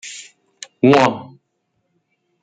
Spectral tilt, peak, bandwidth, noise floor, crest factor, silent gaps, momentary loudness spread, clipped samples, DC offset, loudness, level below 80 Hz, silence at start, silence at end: -5.5 dB/octave; -2 dBFS; 9.4 kHz; -70 dBFS; 18 dB; none; 25 LU; under 0.1%; under 0.1%; -14 LUFS; -62 dBFS; 0.05 s; 1.2 s